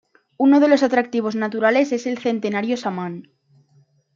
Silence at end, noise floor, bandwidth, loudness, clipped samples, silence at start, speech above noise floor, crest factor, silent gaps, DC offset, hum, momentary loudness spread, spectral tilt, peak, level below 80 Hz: 0.95 s; -58 dBFS; 7.4 kHz; -19 LUFS; under 0.1%; 0.4 s; 40 dB; 16 dB; none; under 0.1%; none; 12 LU; -5.5 dB/octave; -4 dBFS; -72 dBFS